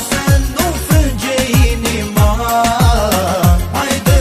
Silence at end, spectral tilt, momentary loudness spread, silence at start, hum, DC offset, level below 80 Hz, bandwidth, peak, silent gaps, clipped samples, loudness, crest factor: 0 s; -5 dB/octave; 4 LU; 0 s; none; under 0.1%; -18 dBFS; 15.5 kHz; 0 dBFS; none; under 0.1%; -13 LUFS; 12 dB